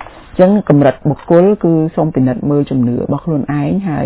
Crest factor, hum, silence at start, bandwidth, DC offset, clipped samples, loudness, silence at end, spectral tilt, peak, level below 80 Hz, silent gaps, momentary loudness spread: 12 dB; none; 0 s; 4 kHz; under 0.1%; 0.4%; -13 LUFS; 0 s; -13 dB/octave; 0 dBFS; -42 dBFS; none; 7 LU